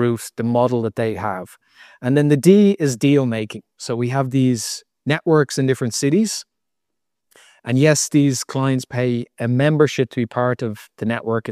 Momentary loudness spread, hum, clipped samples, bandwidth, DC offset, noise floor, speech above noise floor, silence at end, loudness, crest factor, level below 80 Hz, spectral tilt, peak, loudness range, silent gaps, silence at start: 12 LU; none; under 0.1%; 15 kHz; under 0.1%; -82 dBFS; 64 dB; 0 s; -19 LUFS; 18 dB; -62 dBFS; -5.5 dB/octave; 0 dBFS; 3 LU; none; 0 s